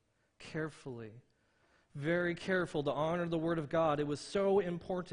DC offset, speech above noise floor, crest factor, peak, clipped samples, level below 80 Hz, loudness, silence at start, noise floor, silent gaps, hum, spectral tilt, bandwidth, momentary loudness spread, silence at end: under 0.1%; 37 dB; 16 dB; -20 dBFS; under 0.1%; -66 dBFS; -35 LUFS; 0.4 s; -72 dBFS; none; none; -6.5 dB/octave; 10 kHz; 15 LU; 0 s